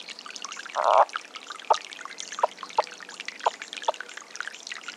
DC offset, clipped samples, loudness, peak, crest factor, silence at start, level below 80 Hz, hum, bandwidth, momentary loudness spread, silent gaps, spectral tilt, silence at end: under 0.1%; under 0.1%; -28 LUFS; -6 dBFS; 24 dB; 0 s; under -90 dBFS; none; 12.5 kHz; 16 LU; none; 0.5 dB/octave; 0 s